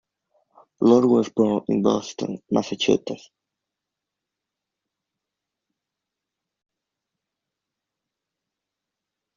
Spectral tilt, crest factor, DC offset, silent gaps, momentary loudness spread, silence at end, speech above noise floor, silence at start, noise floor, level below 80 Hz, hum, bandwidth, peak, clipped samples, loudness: -5.5 dB/octave; 22 dB; under 0.1%; none; 14 LU; 6.2 s; 65 dB; 0.8 s; -85 dBFS; -66 dBFS; none; 7.4 kHz; -4 dBFS; under 0.1%; -21 LUFS